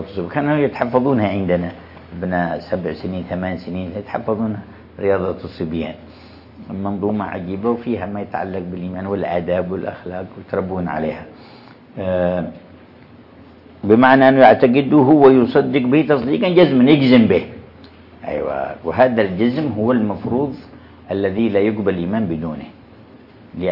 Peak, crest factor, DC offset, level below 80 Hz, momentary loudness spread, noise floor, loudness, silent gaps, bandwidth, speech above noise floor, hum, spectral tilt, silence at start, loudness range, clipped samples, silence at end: 0 dBFS; 18 dB; under 0.1%; -52 dBFS; 17 LU; -43 dBFS; -17 LUFS; none; 5.6 kHz; 27 dB; none; -10 dB/octave; 0 s; 12 LU; under 0.1%; 0 s